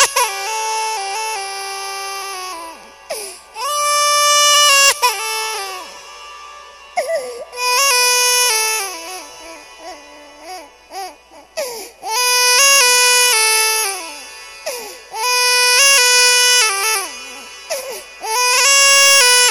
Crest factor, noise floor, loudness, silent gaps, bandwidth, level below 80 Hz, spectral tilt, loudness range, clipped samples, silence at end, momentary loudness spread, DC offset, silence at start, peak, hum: 16 dB; -40 dBFS; -12 LUFS; none; over 20 kHz; -60 dBFS; 3.5 dB/octave; 10 LU; under 0.1%; 0 s; 22 LU; under 0.1%; 0 s; 0 dBFS; none